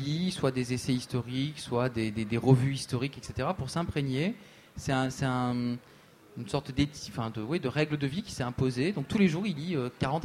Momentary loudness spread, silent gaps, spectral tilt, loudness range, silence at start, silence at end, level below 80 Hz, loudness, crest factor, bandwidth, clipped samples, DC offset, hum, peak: 9 LU; none; -6 dB/octave; 3 LU; 0 s; 0 s; -54 dBFS; -31 LUFS; 20 dB; 14 kHz; under 0.1%; under 0.1%; none; -10 dBFS